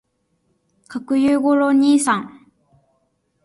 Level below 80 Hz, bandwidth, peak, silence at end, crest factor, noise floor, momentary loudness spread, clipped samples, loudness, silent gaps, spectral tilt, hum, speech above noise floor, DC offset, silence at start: -62 dBFS; 11.5 kHz; -6 dBFS; 1.15 s; 14 dB; -67 dBFS; 18 LU; under 0.1%; -17 LUFS; none; -4 dB/octave; none; 51 dB; under 0.1%; 0.9 s